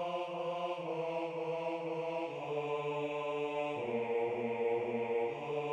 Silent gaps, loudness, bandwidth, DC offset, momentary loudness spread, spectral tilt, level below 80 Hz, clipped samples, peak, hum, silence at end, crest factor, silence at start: none; -37 LUFS; 9 kHz; under 0.1%; 4 LU; -6.5 dB/octave; -80 dBFS; under 0.1%; -24 dBFS; none; 0 s; 12 dB; 0 s